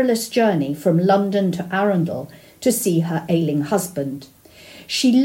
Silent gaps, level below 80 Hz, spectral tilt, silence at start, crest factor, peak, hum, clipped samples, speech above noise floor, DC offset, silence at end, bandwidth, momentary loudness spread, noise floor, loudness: none; -60 dBFS; -5.5 dB/octave; 0 s; 16 dB; -4 dBFS; none; under 0.1%; 25 dB; under 0.1%; 0 s; 16.5 kHz; 11 LU; -43 dBFS; -20 LUFS